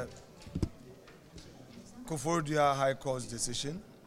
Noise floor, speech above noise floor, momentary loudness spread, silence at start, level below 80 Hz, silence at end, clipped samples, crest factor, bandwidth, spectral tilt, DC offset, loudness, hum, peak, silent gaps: -54 dBFS; 22 dB; 24 LU; 0 s; -54 dBFS; 0 s; under 0.1%; 20 dB; 16 kHz; -4.5 dB/octave; under 0.1%; -34 LUFS; none; -16 dBFS; none